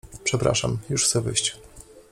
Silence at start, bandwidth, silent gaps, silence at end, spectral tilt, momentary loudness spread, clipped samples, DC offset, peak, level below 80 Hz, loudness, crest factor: 0.05 s; 14.5 kHz; none; 0.1 s; -3 dB/octave; 6 LU; under 0.1%; under 0.1%; -8 dBFS; -48 dBFS; -23 LUFS; 18 dB